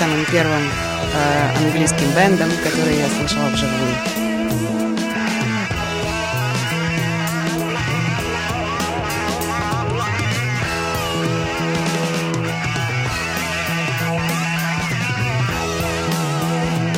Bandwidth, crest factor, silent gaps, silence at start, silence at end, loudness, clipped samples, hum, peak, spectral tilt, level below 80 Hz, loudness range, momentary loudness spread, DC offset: 16.5 kHz; 16 dB; none; 0 s; 0 s; -19 LUFS; under 0.1%; none; -2 dBFS; -4.5 dB/octave; -40 dBFS; 4 LU; 5 LU; under 0.1%